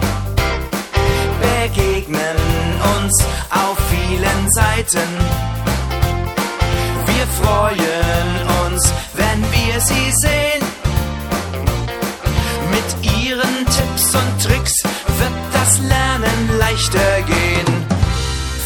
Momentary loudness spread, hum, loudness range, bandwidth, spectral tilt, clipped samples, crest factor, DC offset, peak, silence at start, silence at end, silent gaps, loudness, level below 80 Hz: 6 LU; none; 2 LU; 17.5 kHz; -4 dB/octave; under 0.1%; 16 dB; under 0.1%; 0 dBFS; 0 s; 0 s; none; -16 LUFS; -24 dBFS